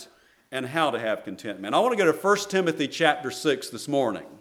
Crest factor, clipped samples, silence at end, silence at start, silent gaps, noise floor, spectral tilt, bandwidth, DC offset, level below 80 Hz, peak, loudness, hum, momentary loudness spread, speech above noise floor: 22 dB; under 0.1%; 0.05 s; 0 s; none; -53 dBFS; -4 dB/octave; 17 kHz; under 0.1%; -74 dBFS; -4 dBFS; -25 LUFS; none; 10 LU; 28 dB